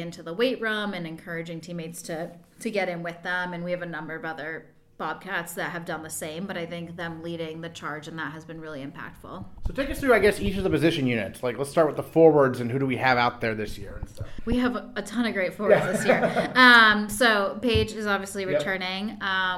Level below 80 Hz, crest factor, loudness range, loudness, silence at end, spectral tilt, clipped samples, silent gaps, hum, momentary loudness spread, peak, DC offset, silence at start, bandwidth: -46 dBFS; 22 dB; 13 LU; -24 LUFS; 0 s; -4.5 dB/octave; under 0.1%; none; none; 16 LU; -2 dBFS; under 0.1%; 0 s; 16 kHz